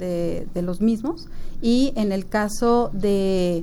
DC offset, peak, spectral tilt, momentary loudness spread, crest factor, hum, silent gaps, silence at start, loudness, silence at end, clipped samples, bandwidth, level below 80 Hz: under 0.1%; -8 dBFS; -6 dB/octave; 8 LU; 14 dB; none; none; 0 s; -22 LUFS; 0 s; under 0.1%; 16.5 kHz; -34 dBFS